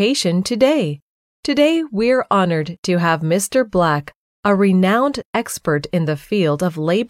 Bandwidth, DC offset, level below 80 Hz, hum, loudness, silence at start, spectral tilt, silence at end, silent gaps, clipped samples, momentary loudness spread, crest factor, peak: 15.5 kHz; under 0.1%; -52 dBFS; none; -17 LUFS; 0 s; -5.5 dB/octave; 0.05 s; 1.02-1.43 s, 2.78-2.83 s, 4.15-4.43 s, 5.25-5.33 s; under 0.1%; 7 LU; 16 dB; -2 dBFS